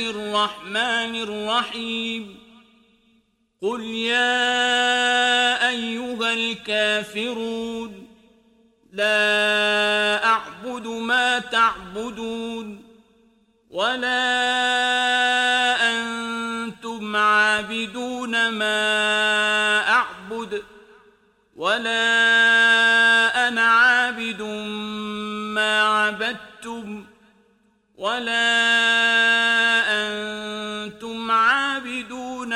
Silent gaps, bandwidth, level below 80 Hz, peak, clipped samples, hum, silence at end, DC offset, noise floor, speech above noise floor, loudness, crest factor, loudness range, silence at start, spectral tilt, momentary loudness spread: none; 14 kHz; -62 dBFS; -6 dBFS; under 0.1%; none; 0 s; under 0.1%; -64 dBFS; 42 dB; -20 LUFS; 16 dB; 7 LU; 0 s; -1.5 dB/octave; 15 LU